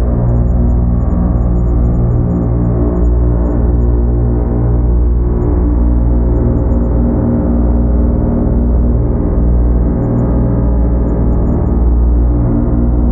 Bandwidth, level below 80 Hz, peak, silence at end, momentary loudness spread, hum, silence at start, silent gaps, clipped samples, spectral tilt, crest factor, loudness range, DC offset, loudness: 2.1 kHz; -12 dBFS; 0 dBFS; 0 s; 1 LU; 60 Hz at -20 dBFS; 0 s; none; under 0.1%; -14 dB/octave; 10 dB; 0 LU; under 0.1%; -13 LUFS